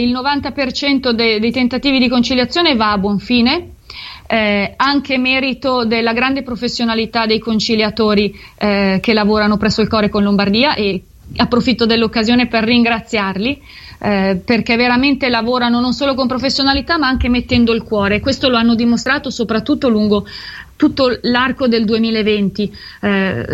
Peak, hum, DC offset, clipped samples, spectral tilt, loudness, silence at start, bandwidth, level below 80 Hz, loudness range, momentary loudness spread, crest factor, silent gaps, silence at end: 0 dBFS; none; under 0.1%; under 0.1%; -5.5 dB/octave; -14 LUFS; 0 s; 8 kHz; -36 dBFS; 1 LU; 6 LU; 14 dB; none; 0 s